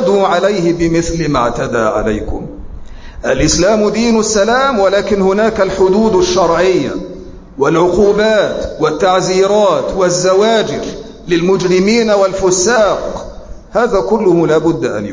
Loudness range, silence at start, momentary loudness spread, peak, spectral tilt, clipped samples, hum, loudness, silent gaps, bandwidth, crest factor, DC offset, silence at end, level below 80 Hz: 3 LU; 0 s; 11 LU; 0 dBFS; -4.5 dB/octave; under 0.1%; none; -12 LUFS; none; 7.6 kHz; 12 dB; under 0.1%; 0 s; -32 dBFS